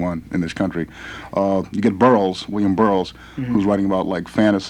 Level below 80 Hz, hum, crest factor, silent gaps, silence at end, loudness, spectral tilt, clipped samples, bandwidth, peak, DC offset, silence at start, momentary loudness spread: -48 dBFS; none; 18 dB; none; 0 s; -19 LUFS; -7 dB/octave; under 0.1%; 11 kHz; -2 dBFS; under 0.1%; 0 s; 12 LU